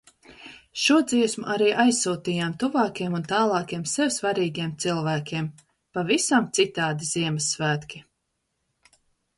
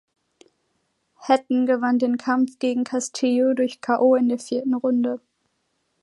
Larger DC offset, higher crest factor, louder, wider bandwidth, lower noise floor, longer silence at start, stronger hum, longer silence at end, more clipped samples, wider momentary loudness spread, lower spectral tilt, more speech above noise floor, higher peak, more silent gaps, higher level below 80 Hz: neither; about the same, 18 dB vs 18 dB; about the same, -24 LUFS vs -22 LUFS; about the same, 11.5 kHz vs 11.5 kHz; first, -77 dBFS vs -72 dBFS; second, 0.3 s vs 1.2 s; neither; first, 1.35 s vs 0.85 s; neither; first, 11 LU vs 7 LU; about the same, -4 dB/octave vs -4 dB/octave; about the same, 53 dB vs 51 dB; about the same, -6 dBFS vs -4 dBFS; neither; first, -64 dBFS vs -78 dBFS